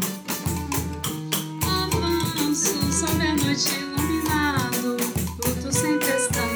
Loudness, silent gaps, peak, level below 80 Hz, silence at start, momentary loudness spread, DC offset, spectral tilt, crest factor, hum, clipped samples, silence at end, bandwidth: -23 LUFS; none; -6 dBFS; -40 dBFS; 0 s; 5 LU; under 0.1%; -3.5 dB/octave; 18 dB; none; under 0.1%; 0 s; over 20 kHz